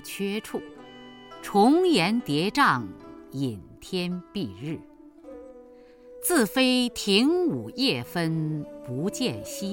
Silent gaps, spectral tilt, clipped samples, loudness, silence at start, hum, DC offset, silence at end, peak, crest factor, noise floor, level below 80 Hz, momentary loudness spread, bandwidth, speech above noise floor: none; -4.5 dB/octave; under 0.1%; -25 LUFS; 0 s; none; under 0.1%; 0 s; -6 dBFS; 20 dB; -50 dBFS; -60 dBFS; 23 LU; 17 kHz; 25 dB